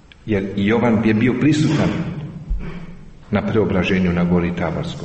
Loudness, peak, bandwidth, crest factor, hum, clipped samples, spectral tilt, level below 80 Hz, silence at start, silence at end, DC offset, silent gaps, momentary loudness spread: -18 LUFS; -6 dBFS; 8.4 kHz; 12 dB; none; under 0.1%; -7.5 dB/octave; -34 dBFS; 0.25 s; 0 s; under 0.1%; none; 13 LU